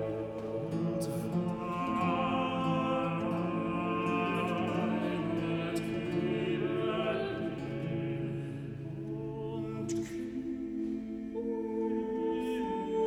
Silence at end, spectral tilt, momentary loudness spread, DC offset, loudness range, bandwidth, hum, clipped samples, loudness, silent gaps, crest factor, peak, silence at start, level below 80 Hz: 0 s; -7 dB/octave; 7 LU; under 0.1%; 6 LU; 16 kHz; none; under 0.1%; -34 LUFS; none; 14 dB; -18 dBFS; 0 s; -60 dBFS